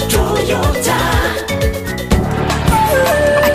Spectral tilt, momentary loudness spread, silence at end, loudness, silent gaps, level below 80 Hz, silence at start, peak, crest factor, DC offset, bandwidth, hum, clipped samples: -4.5 dB/octave; 5 LU; 0 s; -14 LUFS; none; -22 dBFS; 0 s; 0 dBFS; 14 dB; under 0.1%; 15.5 kHz; none; under 0.1%